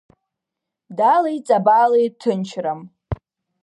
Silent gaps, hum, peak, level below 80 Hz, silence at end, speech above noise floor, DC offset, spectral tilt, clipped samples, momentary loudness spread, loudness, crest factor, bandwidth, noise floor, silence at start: none; none; -4 dBFS; -46 dBFS; 0.5 s; 66 dB; under 0.1%; -6.5 dB/octave; under 0.1%; 17 LU; -18 LUFS; 16 dB; 11 kHz; -83 dBFS; 0.9 s